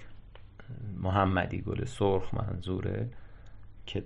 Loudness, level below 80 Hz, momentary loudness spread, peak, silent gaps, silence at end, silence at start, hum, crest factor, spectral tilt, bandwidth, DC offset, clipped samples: -32 LUFS; -46 dBFS; 17 LU; -12 dBFS; none; 0 s; 0 s; none; 20 dB; -7.5 dB/octave; 10.5 kHz; under 0.1%; under 0.1%